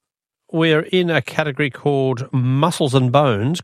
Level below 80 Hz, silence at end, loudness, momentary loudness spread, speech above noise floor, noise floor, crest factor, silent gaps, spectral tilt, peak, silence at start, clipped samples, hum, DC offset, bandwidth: -60 dBFS; 0 s; -18 LUFS; 5 LU; 45 dB; -62 dBFS; 18 dB; none; -6 dB/octave; 0 dBFS; 0.55 s; under 0.1%; none; under 0.1%; 13.5 kHz